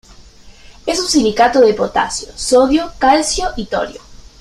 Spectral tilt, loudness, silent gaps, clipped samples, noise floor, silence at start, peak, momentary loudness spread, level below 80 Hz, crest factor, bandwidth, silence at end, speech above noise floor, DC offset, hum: -3 dB/octave; -14 LUFS; none; under 0.1%; -40 dBFS; 0.2 s; 0 dBFS; 10 LU; -36 dBFS; 14 dB; 13.5 kHz; 0.25 s; 26 dB; under 0.1%; none